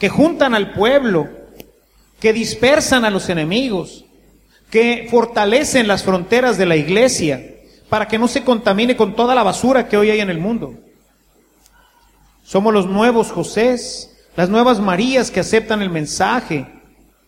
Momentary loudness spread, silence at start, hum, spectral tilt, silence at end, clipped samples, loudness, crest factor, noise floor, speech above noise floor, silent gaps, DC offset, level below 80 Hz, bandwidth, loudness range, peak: 8 LU; 0 s; none; -4.5 dB/octave; 0.6 s; under 0.1%; -15 LUFS; 16 dB; -55 dBFS; 40 dB; none; under 0.1%; -46 dBFS; 16 kHz; 4 LU; 0 dBFS